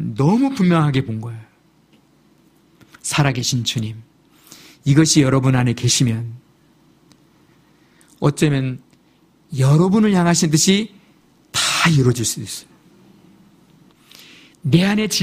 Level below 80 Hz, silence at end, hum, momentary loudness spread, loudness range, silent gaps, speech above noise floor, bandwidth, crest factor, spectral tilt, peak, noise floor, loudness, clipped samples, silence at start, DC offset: -50 dBFS; 0 s; none; 16 LU; 7 LU; none; 39 dB; 15.5 kHz; 18 dB; -4.5 dB/octave; 0 dBFS; -55 dBFS; -17 LUFS; under 0.1%; 0 s; under 0.1%